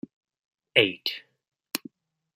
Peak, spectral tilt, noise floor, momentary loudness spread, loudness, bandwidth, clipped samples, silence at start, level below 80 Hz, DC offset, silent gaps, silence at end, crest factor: -4 dBFS; -3 dB/octave; -50 dBFS; 17 LU; -26 LUFS; 16 kHz; under 0.1%; 0.75 s; -78 dBFS; under 0.1%; none; 0.6 s; 28 dB